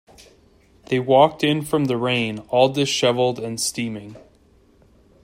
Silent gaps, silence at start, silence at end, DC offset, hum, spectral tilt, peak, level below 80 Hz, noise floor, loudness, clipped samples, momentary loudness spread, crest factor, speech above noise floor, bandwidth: none; 0.9 s; 1.05 s; under 0.1%; none; -4.5 dB/octave; -2 dBFS; -58 dBFS; -55 dBFS; -20 LUFS; under 0.1%; 9 LU; 20 dB; 35 dB; 16 kHz